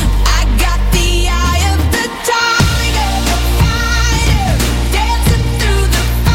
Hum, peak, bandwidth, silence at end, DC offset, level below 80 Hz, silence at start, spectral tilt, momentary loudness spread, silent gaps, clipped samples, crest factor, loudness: none; 0 dBFS; 16.5 kHz; 0 s; under 0.1%; -14 dBFS; 0 s; -4 dB/octave; 3 LU; none; under 0.1%; 12 dB; -13 LUFS